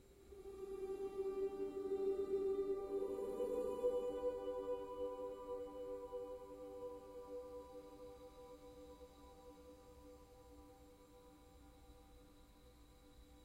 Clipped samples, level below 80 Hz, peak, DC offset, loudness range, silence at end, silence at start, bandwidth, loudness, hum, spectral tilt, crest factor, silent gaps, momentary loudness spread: under 0.1%; -66 dBFS; -28 dBFS; under 0.1%; 21 LU; 0 s; 0 s; 16 kHz; -45 LUFS; none; -6.5 dB/octave; 18 dB; none; 24 LU